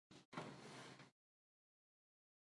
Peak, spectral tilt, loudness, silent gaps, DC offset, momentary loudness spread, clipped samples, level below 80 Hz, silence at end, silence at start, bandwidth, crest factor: -36 dBFS; -4.5 dB/octave; -57 LUFS; 0.25-0.32 s; under 0.1%; 10 LU; under 0.1%; under -90 dBFS; 1.4 s; 0.1 s; 11.5 kHz; 26 dB